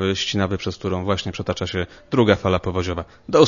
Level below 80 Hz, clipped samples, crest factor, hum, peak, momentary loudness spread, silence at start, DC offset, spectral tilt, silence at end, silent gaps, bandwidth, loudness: -44 dBFS; under 0.1%; 20 dB; none; 0 dBFS; 9 LU; 0 s; under 0.1%; -5.5 dB/octave; 0 s; none; 7.4 kHz; -22 LUFS